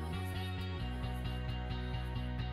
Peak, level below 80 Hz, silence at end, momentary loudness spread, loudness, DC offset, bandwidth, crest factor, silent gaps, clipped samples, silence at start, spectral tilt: -28 dBFS; -42 dBFS; 0 s; 1 LU; -40 LUFS; under 0.1%; 14.5 kHz; 12 dB; none; under 0.1%; 0 s; -6.5 dB/octave